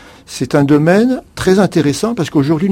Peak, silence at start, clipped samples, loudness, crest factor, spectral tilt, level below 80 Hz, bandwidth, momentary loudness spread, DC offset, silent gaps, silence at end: 0 dBFS; 0.3 s; under 0.1%; -13 LUFS; 12 dB; -6.5 dB/octave; -42 dBFS; 16.5 kHz; 7 LU; under 0.1%; none; 0 s